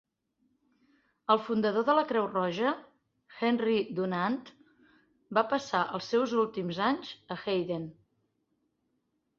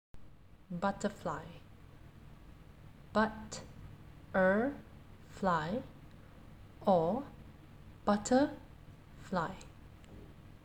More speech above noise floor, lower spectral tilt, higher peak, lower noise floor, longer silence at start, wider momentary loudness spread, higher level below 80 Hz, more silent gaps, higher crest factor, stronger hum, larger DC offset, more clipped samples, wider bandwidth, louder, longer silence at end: first, 49 dB vs 23 dB; about the same, -6 dB/octave vs -6 dB/octave; first, -10 dBFS vs -16 dBFS; first, -78 dBFS vs -56 dBFS; first, 1.3 s vs 0.15 s; second, 11 LU vs 26 LU; second, -74 dBFS vs -58 dBFS; neither; about the same, 22 dB vs 20 dB; neither; neither; neither; second, 7.4 kHz vs 15 kHz; first, -30 LUFS vs -35 LUFS; first, 1.45 s vs 0.1 s